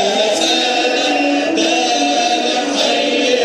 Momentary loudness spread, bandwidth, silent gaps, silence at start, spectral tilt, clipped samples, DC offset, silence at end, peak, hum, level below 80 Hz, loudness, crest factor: 2 LU; 15 kHz; none; 0 s; -1.5 dB/octave; under 0.1%; under 0.1%; 0 s; 0 dBFS; none; -72 dBFS; -14 LUFS; 14 dB